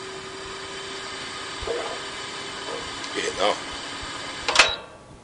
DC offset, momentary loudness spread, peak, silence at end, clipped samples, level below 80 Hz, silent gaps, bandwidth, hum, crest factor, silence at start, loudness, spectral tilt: under 0.1%; 15 LU; -2 dBFS; 0 s; under 0.1%; -50 dBFS; none; 10.5 kHz; none; 26 dB; 0 s; -26 LUFS; -1 dB/octave